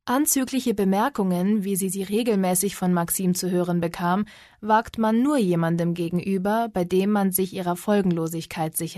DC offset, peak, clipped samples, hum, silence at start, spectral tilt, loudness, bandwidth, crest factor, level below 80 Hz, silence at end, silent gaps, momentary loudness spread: under 0.1%; -8 dBFS; under 0.1%; none; 0.05 s; -5.5 dB/octave; -23 LUFS; 13.5 kHz; 14 dB; -56 dBFS; 0 s; none; 6 LU